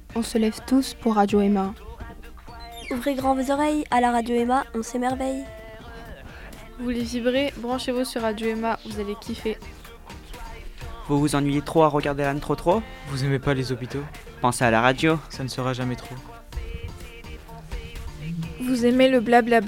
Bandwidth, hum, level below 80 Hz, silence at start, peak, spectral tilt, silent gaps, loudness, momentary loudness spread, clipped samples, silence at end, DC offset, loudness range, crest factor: 17 kHz; none; -42 dBFS; 0 s; -2 dBFS; -5.5 dB/octave; none; -24 LUFS; 21 LU; under 0.1%; 0 s; under 0.1%; 6 LU; 22 dB